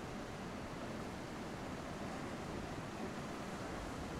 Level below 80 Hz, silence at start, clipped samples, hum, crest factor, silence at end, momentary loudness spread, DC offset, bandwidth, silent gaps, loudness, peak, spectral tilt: -58 dBFS; 0 s; under 0.1%; none; 14 dB; 0 s; 2 LU; under 0.1%; 16 kHz; none; -45 LUFS; -32 dBFS; -5.5 dB/octave